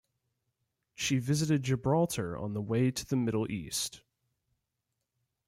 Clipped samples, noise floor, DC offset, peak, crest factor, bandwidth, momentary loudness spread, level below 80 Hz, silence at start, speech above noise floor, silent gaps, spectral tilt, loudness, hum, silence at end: under 0.1%; -85 dBFS; under 0.1%; -18 dBFS; 16 dB; 16 kHz; 6 LU; -62 dBFS; 1 s; 54 dB; none; -5 dB/octave; -31 LUFS; none; 1.5 s